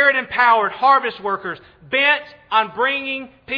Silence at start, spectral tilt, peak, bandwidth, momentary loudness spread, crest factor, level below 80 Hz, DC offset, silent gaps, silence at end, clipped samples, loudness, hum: 0 s; -5 dB/octave; -2 dBFS; 5.4 kHz; 11 LU; 18 dB; -60 dBFS; under 0.1%; none; 0 s; under 0.1%; -18 LUFS; none